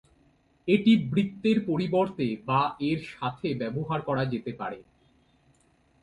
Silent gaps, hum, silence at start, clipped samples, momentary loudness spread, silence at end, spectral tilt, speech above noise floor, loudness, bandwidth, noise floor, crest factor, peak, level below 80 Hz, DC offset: none; none; 0.65 s; under 0.1%; 12 LU; 1.2 s; -8 dB/octave; 38 dB; -27 LUFS; 8.8 kHz; -65 dBFS; 20 dB; -8 dBFS; -62 dBFS; under 0.1%